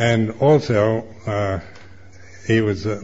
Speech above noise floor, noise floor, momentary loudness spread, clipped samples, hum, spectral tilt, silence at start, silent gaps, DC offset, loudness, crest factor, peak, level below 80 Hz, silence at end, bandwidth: 26 dB; -44 dBFS; 10 LU; under 0.1%; none; -7 dB/octave; 0 s; none; 0.8%; -19 LUFS; 16 dB; -4 dBFS; -48 dBFS; 0 s; 7.8 kHz